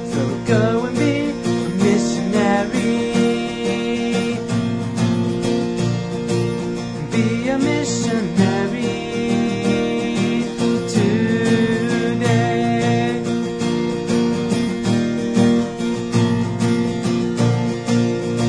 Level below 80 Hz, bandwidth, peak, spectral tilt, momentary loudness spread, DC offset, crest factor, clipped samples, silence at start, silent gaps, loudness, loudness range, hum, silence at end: -46 dBFS; 10.5 kHz; -2 dBFS; -6 dB/octave; 4 LU; under 0.1%; 16 dB; under 0.1%; 0 s; none; -19 LUFS; 2 LU; none; 0 s